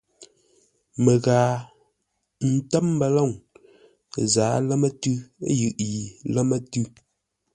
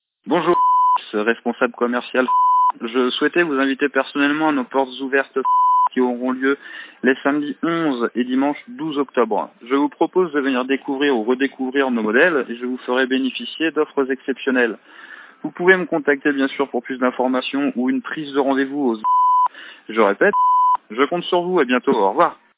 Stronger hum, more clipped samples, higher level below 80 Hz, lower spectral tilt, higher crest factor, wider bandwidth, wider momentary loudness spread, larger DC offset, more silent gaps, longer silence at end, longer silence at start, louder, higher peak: neither; neither; first, -58 dBFS vs -78 dBFS; second, -6 dB/octave vs -9 dB/octave; about the same, 20 dB vs 18 dB; first, 10.5 kHz vs 4 kHz; first, 10 LU vs 7 LU; neither; neither; first, 0.65 s vs 0.25 s; about the same, 0.2 s vs 0.25 s; second, -23 LUFS vs -19 LUFS; second, -4 dBFS vs 0 dBFS